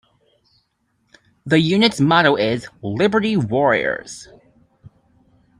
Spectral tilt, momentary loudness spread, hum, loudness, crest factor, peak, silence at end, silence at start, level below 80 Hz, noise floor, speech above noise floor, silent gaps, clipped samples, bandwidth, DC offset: -5.5 dB/octave; 14 LU; none; -17 LUFS; 20 dB; 0 dBFS; 0.7 s; 1.45 s; -56 dBFS; -67 dBFS; 50 dB; none; under 0.1%; 11.5 kHz; under 0.1%